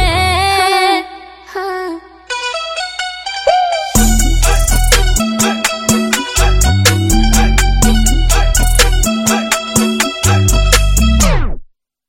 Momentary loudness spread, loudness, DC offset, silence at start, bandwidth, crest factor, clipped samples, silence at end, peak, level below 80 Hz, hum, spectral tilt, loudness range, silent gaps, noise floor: 10 LU; -13 LUFS; under 0.1%; 0 s; 17 kHz; 12 dB; under 0.1%; 0.45 s; 0 dBFS; -14 dBFS; none; -3.5 dB/octave; 4 LU; none; -34 dBFS